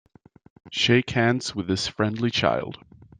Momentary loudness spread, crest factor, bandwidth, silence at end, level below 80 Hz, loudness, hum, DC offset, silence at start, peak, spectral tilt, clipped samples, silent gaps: 9 LU; 22 dB; 9.8 kHz; 0.45 s; -56 dBFS; -23 LUFS; none; under 0.1%; 0.65 s; -4 dBFS; -5 dB/octave; under 0.1%; none